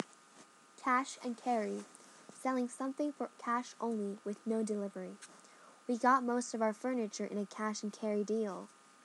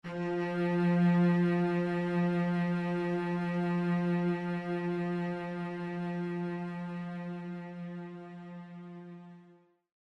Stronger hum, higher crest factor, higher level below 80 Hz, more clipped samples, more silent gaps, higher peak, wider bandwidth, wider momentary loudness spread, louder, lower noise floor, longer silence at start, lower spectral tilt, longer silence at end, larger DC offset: neither; first, 20 dB vs 14 dB; second, under -90 dBFS vs -74 dBFS; neither; neither; about the same, -16 dBFS vs -18 dBFS; first, 12 kHz vs 5.8 kHz; second, 15 LU vs 19 LU; second, -37 LUFS vs -32 LUFS; about the same, -61 dBFS vs -62 dBFS; about the same, 0 s vs 0.05 s; second, -4.5 dB/octave vs -9 dB/octave; about the same, 0.4 s vs 0.5 s; neither